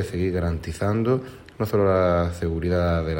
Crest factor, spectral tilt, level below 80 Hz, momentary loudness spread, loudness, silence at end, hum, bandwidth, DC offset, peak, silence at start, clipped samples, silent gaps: 14 dB; -8 dB/octave; -42 dBFS; 7 LU; -23 LUFS; 0 s; none; 16.5 kHz; under 0.1%; -8 dBFS; 0 s; under 0.1%; none